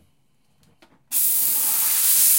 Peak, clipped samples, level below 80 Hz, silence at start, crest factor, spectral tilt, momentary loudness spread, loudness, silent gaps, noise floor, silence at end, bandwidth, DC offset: -4 dBFS; under 0.1%; -74 dBFS; 1.1 s; 18 dB; 3 dB/octave; 5 LU; -17 LUFS; none; -66 dBFS; 0 s; 16.5 kHz; under 0.1%